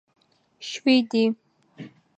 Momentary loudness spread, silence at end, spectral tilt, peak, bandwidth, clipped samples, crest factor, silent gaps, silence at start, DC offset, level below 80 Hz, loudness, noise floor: 24 LU; 0.3 s; -4.5 dB/octave; -6 dBFS; 8.4 kHz; under 0.1%; 20 dB; none; 0.6 s; under 0.1%; -82 dBFS; -23 LUFS; -45 dBFS